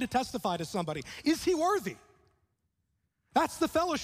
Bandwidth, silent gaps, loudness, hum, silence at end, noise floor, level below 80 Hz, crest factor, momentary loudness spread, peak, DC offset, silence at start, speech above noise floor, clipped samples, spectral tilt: 15.5 kHz; none; -31 LUFS; none; 0 s; -79 dBFS; -60 dBFS; 20 dB; 8 LU; -12 dBFS; under 0.1%; 0 s; 49 dB; under 0.1%; -4.5 dB/octave